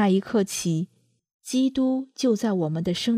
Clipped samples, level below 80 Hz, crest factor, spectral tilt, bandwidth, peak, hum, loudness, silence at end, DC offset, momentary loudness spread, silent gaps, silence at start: under 0.1%; -60 dBFS; 14 dB; -5.5 dB/octave; 15.5 kHz; -10 dBFS; none; -25 LUFS; 0 s; under 0.1%; 6 LU; 1.33-1.39 s; 0 s